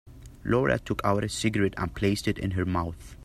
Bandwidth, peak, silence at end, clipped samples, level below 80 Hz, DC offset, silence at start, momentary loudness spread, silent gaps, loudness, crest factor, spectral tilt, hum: 14.5 kHz; -8 dBFS; 0 s; under 0.1%; -46 dBFS; under 0.1%; 0.05 s; 5 LU; none; -27 LUFS; 18 dB; -6 dB/octave; none